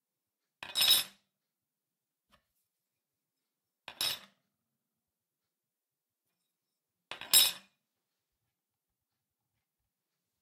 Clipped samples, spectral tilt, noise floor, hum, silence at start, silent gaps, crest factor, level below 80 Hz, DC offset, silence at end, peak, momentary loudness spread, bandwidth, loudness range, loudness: under 0.1%; 2 dB/octave; under -90 dBFS; none; 0.6 s; none; 30 dB; -82 dBFS; under 0.1%; 2.85 s; -8 dBFS; 23 LU; 16 kHz; 11 LU; -27 LUFS